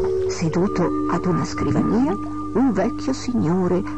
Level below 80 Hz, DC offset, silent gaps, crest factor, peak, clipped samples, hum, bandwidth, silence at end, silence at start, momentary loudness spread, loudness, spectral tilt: -42 dBFS; 2%; none; 12 dB; -8 dBFS; under 0.1%; none; 9.6 kHz; 0 s; 0 s; 4 LU; -21 LUFS; -7 dB/octave